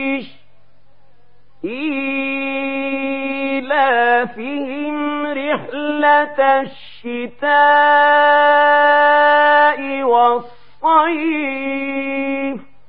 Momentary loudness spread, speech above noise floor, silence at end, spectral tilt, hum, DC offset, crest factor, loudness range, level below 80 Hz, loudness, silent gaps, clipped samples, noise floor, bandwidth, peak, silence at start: 13 LU; 42 dB; 0.25 s; -7 dB/octave; none; 1%; 14 dB; 8 LU; -62 dBFS; -15 LUFS; none; under 0.1%; -57 dBFS; 5.2 kHz; -2 dBFS; 0 s